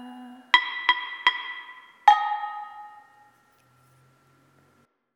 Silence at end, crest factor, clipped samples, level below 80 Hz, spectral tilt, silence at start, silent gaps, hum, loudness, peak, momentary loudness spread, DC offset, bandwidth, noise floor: 2.2 s; 28 dB; under 0.1%; -90 dBFS; 0 dB/octave; 0 s; none; none; -23 LUFS; 0 dBFS; 23 LU; under 0.1%; 11.5 kHz; -65 dBFS